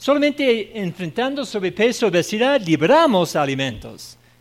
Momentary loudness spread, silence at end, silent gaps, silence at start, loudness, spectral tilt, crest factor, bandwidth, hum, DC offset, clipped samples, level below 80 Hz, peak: 12 LU; 0.25 s; none; 0 s; -19 LUFS; -5 dB/octave; 14 dB; 16 kHz; none; under 0.1%; under 0.1%; -54 dBFS; -4 dBFS